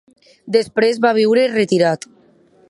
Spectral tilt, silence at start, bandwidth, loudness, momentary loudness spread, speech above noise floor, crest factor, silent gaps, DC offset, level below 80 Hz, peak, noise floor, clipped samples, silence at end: -5 dB/octave; 0.45 s; 11.5 kHz; -16 LUFS; 5 LU; 37 dB; 16 dB; none; under 0.1%; -64 dBFS; -2 dBFS; -52 dBFS; under 0.1%; 0.75 s